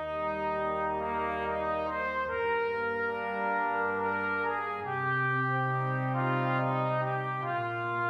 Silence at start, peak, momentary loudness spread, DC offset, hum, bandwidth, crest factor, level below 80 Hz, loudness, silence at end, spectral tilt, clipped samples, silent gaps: 0 s; -18 dBFS; 4 LU; under 0.1%; none; 6 kHz; 12 dB; -58 dBFS; -31 LUFS; 0 s; -8.5 dB/octave; under 0.1%; none